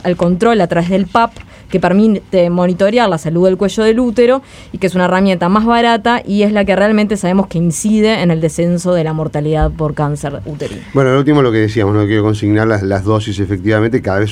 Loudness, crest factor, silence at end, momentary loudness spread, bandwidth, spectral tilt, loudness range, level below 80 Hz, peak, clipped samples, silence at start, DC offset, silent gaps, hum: -13 LUFS; 12 dB; 0 s; 6 LU; 14.5 kHz; -6.5 dB/octave; 2 LU; -34 dBFS; 0 dBFS; under 0.1%; 0.05 s; under 0.1%; none; none